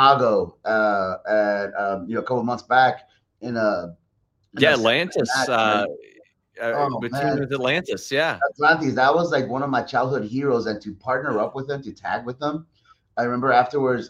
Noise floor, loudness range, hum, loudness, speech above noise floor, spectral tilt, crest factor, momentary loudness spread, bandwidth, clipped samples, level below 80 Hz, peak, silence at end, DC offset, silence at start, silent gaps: -69 dBFS; 4 LU; none; -22 LUFS; 47 dB; -5 dB/octave; 20 dB; 12 LU; 14.5 kHz; under 0.1%; -62 dBFS; -2 dBFS; 0 s; under 0.1%; 0 s; none